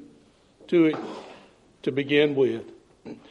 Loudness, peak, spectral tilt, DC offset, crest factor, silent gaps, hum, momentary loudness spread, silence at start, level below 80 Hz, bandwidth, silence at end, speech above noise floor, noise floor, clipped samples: -24 LUFS; -6 dBFS; -7 dB/octave; under 0.1%; 20 dB; none; none; 20 LU; 0 s; -70 dBFS; 8.4 kHz; 0.15 s; 35 dB; -57 dBFS; under 0.1%